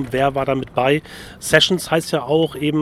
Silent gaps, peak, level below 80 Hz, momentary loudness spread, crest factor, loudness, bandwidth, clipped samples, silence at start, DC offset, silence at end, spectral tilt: none; 0 dBFS; -46 dBFS; 7 LU; 18 dB; -18 LUFS; 16 kHz; under 0.1%; 0 s; under 0.1%; 0 s; -4.5 dB/octave